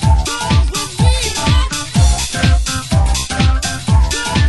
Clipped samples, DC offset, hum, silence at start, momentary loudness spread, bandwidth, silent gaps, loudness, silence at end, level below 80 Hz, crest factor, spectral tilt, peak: under 0.1%; under 0.1%; none; 0 s; 3 LU; 12.5 kHz; none; -15 LUFS; 0 s; -16 dBFS; 12 dB; -4 dB/octave; 0 dBFS